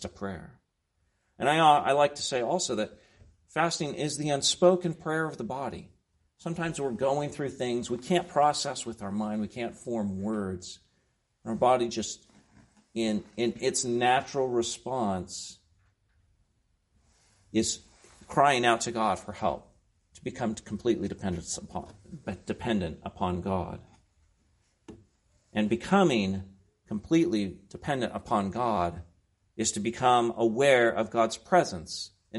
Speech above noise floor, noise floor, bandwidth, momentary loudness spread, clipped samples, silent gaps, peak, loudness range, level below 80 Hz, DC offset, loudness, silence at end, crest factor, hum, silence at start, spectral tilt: 47 dB; -75 dBFS; 11.5 kHz; 15 LU; under 0.1%; none; -6 dBFS; 8 LU; -60 dBFS; under 0.1%; -28 LUFS; 0 s; 22 dB; none; 0 s; -4.5 dB/octave